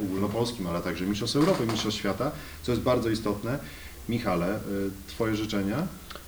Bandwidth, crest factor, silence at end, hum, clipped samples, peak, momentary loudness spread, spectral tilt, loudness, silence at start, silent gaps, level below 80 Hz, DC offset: over 20 kHz; 18 dB; 0 s; none; under 0.1%; -10 dBFS; 9 LU; -5.5 dB/octave; -29 LUFS; 0 s; none; -48 dBFS; under 0.1%